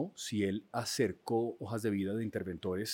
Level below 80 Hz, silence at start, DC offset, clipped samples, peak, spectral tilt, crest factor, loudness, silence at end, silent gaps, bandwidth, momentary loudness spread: -74 dBFS; 0 s; under 0.1%; under 0.1%; -18 dBFS; -5 dB/octave; 18 dB; -36 LUFS; 0 s; none; 17 kHz; 5 LU